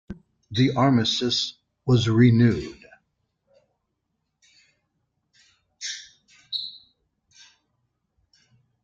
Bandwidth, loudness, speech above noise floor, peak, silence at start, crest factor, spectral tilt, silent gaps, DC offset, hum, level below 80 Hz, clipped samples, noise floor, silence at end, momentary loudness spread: 7.6 kHz; -22 LUFS; 58 dB; -6 dBFS; 0.1 s; 20 dB; -6 dB/octave; none; under 0.1%; none; -56 dBFS; under 0.1%; -78 dBFS; 2.05 s; 20 LU